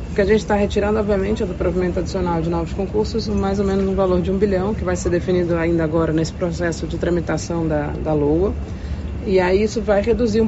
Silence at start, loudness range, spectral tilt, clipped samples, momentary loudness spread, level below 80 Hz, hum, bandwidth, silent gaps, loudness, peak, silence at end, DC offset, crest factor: 0 s; 1 LU; -6.5 dB/octave; under 0.1%; 5 LU; -30 dBFS; none; 8 kHz; none; -20 LUFS; -4 dBFS; 0 s; under 0.1%; 14 dB